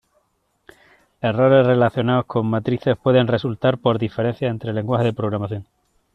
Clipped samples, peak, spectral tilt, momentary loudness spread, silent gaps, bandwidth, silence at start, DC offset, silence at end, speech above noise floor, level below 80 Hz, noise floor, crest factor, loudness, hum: under 0.1%; -4 dBFS; -9 dB/octave; 10 LU; none; 5.8 kHz; 1.25 s; under 0.1%; 0.5 s; 48 dB; -56 dBFS; -67 dBFS; 16 dB; -19 LUFS; none